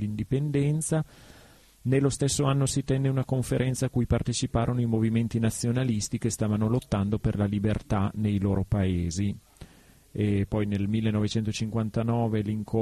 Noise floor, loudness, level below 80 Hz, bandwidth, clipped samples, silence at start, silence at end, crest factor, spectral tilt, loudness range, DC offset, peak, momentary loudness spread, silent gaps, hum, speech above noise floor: -55 dBFS; -27 LUFS; -44 dBFS; 13 kHz; under 0.1%; 0 s; 0 s; 16 dB; -6 dB/octave; 2 LU; under 0.1%; -10 dBFS; 4 LU; none; none; 29 dB